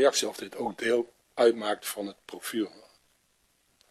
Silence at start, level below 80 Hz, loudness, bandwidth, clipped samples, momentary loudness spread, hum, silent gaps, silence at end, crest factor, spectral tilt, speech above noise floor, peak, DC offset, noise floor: 0 s; -76 dBFS; -30 LUFS; 14.5 kHz; under 0.1%; 13 LU; none; none; 1.2 s; 20 dB; -2.5 dB/octave; 42 dB; -10 dBFS; under 0.1%; -70 dBFS